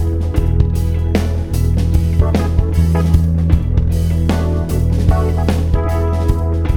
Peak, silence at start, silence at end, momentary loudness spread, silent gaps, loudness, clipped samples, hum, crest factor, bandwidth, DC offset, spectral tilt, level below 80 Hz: 0 dBFS; 0 s; 0 s; 3 LU; none; -16 LUFS; under 0.1%; none; 14 dB; 15 kHz; 0.9%; -8 dB/octave; -18 dBFS